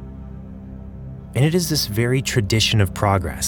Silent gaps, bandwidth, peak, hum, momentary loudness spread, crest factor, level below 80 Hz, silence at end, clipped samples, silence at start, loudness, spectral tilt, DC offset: none; 18 kHz; -2 dBFS; none; 19 LU; 20 dB; -38 dBFS; 0 s; under 0.1%; 0 s; -19 LUFS; -4.5 dB/octave; under 0.1%